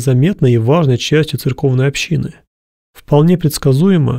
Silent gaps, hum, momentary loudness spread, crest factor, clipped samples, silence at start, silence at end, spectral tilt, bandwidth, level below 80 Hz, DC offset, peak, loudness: 2.47-2.93 s; none; 6 LU; 12 dB; under 0.1%; 0 s; 0 s; -6.5 dB/octave; 16 kHz; -40 dBFS; under 0.1%; -2 dBFS; -13 LUFS